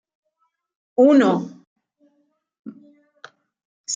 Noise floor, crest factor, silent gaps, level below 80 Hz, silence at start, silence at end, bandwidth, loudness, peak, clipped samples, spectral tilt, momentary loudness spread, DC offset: -72 dBFS; 20 dB; 1.67-1.76 s, 2.59-2.64 s, 3.65-3.84 s; -78 dBFS; 1 s; 0 s; 7.8 kHz; -17 LUFS; -4 dBFS; under 0.1%; -5 dB/octave; 28 LU; under 0.1%